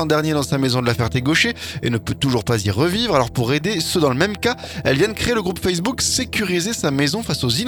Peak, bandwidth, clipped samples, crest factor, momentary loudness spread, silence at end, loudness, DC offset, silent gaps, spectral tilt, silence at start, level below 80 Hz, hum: -2 dBFS; 19 kHz; under 0.1%; 18 dB; 4 LU; 0 s; -19 LUFS; under 0.1%; none; -4.5 dB/octave; 0 s; -42 dBFS; none